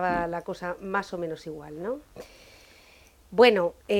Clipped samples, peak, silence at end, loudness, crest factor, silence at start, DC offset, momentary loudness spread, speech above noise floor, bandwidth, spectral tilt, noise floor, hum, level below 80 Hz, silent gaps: under 0.1%; -4 dBFS; 0 s; -26 LUFS; 24 dB; 0 s; under 0.1%; 21 LU; 29 dB; 15 kHz; -5.5 dB/octave; -56 dBFS; none; -56 dBFS; none